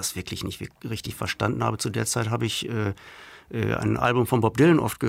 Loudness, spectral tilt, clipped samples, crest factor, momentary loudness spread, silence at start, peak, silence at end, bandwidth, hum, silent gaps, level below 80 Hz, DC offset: -25 LUFS; -5 dB/octave; under 0.1%; 18 dB; 15 LU; 0 s; -8 dBFS; 0 s; 16 kHz; none; none; -52 dBFS; under 0.1%